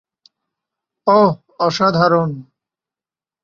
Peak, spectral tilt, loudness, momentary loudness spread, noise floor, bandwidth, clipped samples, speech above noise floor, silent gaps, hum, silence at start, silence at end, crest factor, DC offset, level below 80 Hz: -2 dBFS; -6.5 dB/octave; -16 LUFS; 10 LU; under -90 dBFS; 7.4 kHz; under 0.1%; over 76 dB; none; none; 1.05 s; 1 s; 18 dB; under 0.1%; -58 dBFS